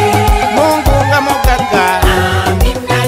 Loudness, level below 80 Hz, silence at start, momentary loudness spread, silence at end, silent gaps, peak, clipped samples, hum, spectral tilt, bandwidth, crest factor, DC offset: -11 LUFS; -16 dBFS; 0 s; 2 LU; 0 s; none; 0 dBFS; under 0.1%; none; -5 dB/octave; 16.5 kHz; 10 dB; under 0.1%